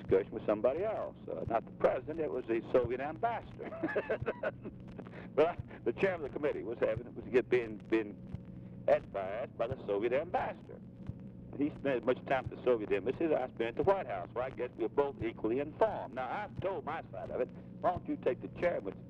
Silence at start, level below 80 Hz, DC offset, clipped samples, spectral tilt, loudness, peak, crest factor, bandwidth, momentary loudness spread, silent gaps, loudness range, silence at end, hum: 0 s; -60 dBFS; under 0.1%; under 0.1%; -8.5 dB/octave; -35 LUFS; -18 dBFS; 18 dB; 7 kHz; 11 LU; none; 3 LU; 0 s; none